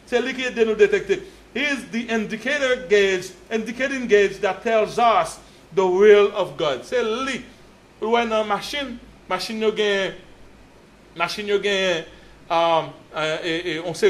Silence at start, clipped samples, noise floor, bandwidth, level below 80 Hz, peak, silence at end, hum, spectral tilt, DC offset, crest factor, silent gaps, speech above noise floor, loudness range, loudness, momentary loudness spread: 0.1 s; under 0.1%; -49 dBFS; 13 kHz; -54 dBFS; -2 dBFS; 0 s; none; -4 dB/octave; under 0.1%; 20 dB; none; 28 dB; 6 LU; -21 LUFS; 10 LU